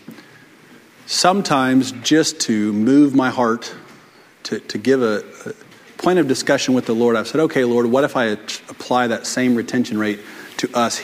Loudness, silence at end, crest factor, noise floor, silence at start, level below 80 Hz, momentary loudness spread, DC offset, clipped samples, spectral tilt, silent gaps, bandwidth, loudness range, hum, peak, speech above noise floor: -18 LUFS; 0 s; 18 dB; -47 dBFS; 0.1 s; -62 dBFS; 13 LU; under 0.1%; under 0.1%; -4 dB/octave; none; 16 kHz; 4 LU; none; 0 dBFS; 30 dB